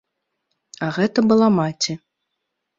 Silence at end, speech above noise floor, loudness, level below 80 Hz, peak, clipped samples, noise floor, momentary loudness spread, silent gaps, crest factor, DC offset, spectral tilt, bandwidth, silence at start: 0.8 s; 60 dB; -19 LUFS; -62 dBFS; -4 dBFS; under 0.1%; -78 dBFS; 12 LU; none; 18 dB; under 0.1%; -5.5 dB/octave; 7.6 kHz; 0.8 s